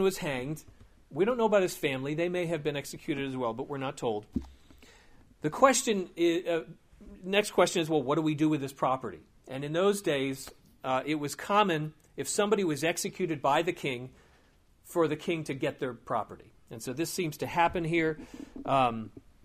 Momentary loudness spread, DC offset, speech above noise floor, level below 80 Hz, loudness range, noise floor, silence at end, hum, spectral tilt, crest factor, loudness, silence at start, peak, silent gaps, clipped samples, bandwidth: 14 LU; under 0.1%; 33 dB; -58 dBFS; 5 LU; -63 dBFS; 0.25 s; none; -4.5 dB/octave; 24 dB; -30 LUFS; 0 s; -6 dBFS; none; under 0.1%; 15.5 kHz